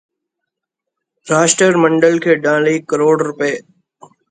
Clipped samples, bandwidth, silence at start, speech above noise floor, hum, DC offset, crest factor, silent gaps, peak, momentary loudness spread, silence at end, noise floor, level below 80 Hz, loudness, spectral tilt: under 0.1%; 9.6 kHz; 1.25 s; 67 dB; none; under 0.1%; 16 dB; none; 0 dBFS; 8 LU; 0.7 s; -80 dBFS; -62 dBFS; -13 LUFS; -4 dB/octave